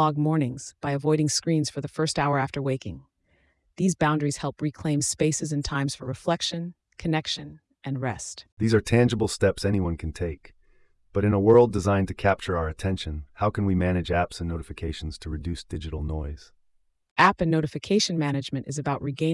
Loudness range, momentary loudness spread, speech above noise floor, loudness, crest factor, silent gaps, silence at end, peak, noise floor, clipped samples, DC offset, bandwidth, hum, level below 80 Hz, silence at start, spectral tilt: 5 LU; 13 LU; 42 dB; -26 LUFS; 20 dB; 8.52-8.57 s, 17.11-17.16 s; 0 s; -6 dBFS; -67 dBFS; under 0.1%; under 0.1%; 12 kHz; none; -46 dBFS; 0 s; -5.5 dB/octave